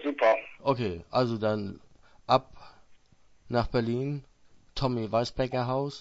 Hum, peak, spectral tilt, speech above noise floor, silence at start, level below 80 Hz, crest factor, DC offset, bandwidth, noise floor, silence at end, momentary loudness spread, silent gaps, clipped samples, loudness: none; -8 dBFS; -7 dB/octave; 31 dB; 0 s; -50 dBFS; 20 dB; under 0.1%; 8 kHz; -59 dBFS; 0 s; 9 LU; none; under 0.1%; -29 LUFS